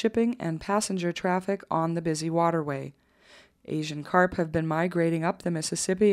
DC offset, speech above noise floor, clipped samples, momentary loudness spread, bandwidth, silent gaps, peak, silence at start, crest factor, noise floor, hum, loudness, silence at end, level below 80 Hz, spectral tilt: under 0.1%; 30 dB; under 0.1%; 8 LU; 14.5 kHz; none; -6 dBFS; 0 s; 20 dB; -56 dBFS; none; -27 LUFS; 0 s; -58 dBFS; -5.5 dB/octave